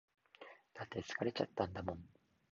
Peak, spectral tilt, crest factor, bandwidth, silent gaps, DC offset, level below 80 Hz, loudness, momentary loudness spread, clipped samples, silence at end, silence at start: -20 dBFS; -4 dB/octave; 24 dB; 7.2 kHz; none; under 0.1%; -64 dBFS; -43 LUFS; 19 LU; under 0.1%; 0.45 s; 0.4 s